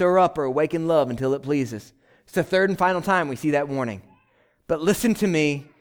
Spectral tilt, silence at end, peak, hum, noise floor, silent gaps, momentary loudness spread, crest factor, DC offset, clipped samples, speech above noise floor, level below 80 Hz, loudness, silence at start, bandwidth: -5.5 dB/octave; 0.2 s; -6 dBFS; none; -63 dBFS; none; 9 LU; 16 dB; under 0.1%; under 0.1%; 41 dB; -56 dBFS; -23 LUFS; 0 s; over 20 kHz